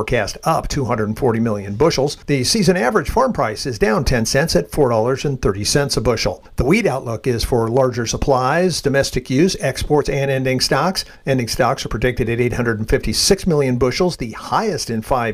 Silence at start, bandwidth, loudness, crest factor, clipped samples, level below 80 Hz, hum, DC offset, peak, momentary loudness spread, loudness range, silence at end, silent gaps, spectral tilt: 0 s; 16 kHz; -18 LUFS; 14 dB; under 0.1%; -32 dBFS; none; under 0.1%; -2 dBFS; 5 LU; 1 LU; 0 s; none; -4.5 dB/octave